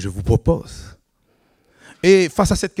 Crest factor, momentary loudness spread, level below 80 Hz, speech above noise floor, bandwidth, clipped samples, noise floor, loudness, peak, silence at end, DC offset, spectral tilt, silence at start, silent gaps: 18 dB; 17 LU; -34 dBFS; 45 dB; 15 kHz; under 0.1%; -62 dBFS; -17 LUFS; -2 dBFS; 0.1 s; under 0.1%; -5.5 dB/octave; 0 s; none